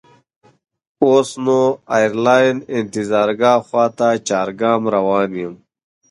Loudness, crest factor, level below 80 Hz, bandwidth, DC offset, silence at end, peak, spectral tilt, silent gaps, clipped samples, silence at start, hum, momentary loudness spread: -16 LUFS; 16 dB; -60 dBFS; 11.5 kHz; under 0.1%; 0.55 s; 0 dBFS; -5 dB/octave; none; under 0.1%; 1 s; none; 8 LU